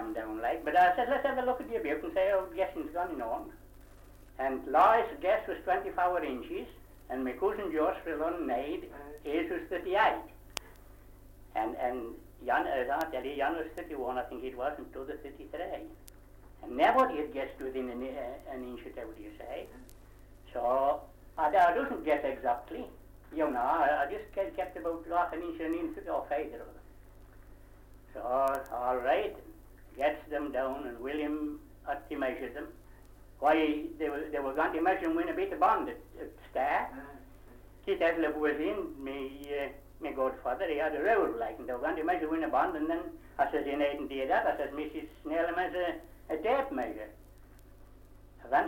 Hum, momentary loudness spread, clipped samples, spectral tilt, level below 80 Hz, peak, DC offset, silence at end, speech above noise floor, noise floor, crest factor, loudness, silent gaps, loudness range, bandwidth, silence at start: 50 Hz at -60 dBFS; 15 LU; under 0.1%; -5.5 dB/octave; -56 dBFS; -10 dBFS; under 0.1%; 0 s; 22 dB; -54 dBFS; 22 dB; -32 LUFS; none; 6 LU; 17 kHz; 0 s